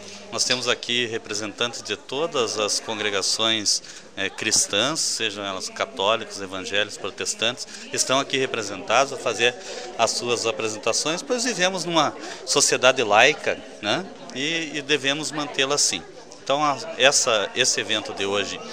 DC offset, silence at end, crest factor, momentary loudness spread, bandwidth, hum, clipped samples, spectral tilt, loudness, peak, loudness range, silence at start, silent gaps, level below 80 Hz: 0.3%; 0 s; 24 dB; 11 LU; 16 kHz; none; under 0.1%; -1.5 dB/octave; -22 LUFS; 0 dBFS; 4 LU; 0 s; none; -66 dBFS